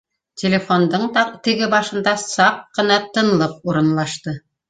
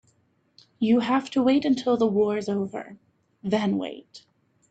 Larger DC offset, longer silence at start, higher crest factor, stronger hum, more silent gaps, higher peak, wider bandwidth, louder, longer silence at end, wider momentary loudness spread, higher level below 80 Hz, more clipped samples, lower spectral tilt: neither; second, 0.35 s vs 0.8 s; about the same, 18 dB vs 16 dB; neither; neither; first, -2 dBFS vs -10 dBFS; first, 9.4 kHz vs 8.2 kHz; first, -18 LUFS vs -24 LUFS; second, 0.3 s vs 0.55 s; second, 6 LU vs 15 LU; first, -58 dBFS vs -68 dBFS; neither; second, -4.5 dB/octave vs -6.5 dB/octave